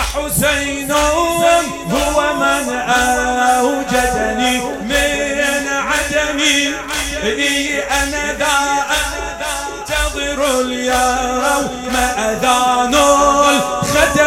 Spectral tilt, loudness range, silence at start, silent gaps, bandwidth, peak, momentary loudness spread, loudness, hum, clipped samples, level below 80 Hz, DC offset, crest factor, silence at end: -2.5 dB/octave; 3 LU; 0 s; none; 17 kHz; 0 dBFS; 6 LU; -15 LUFS; none; under 0.1%; -32 dBFS; under 0.1%; 16 dB; 0 s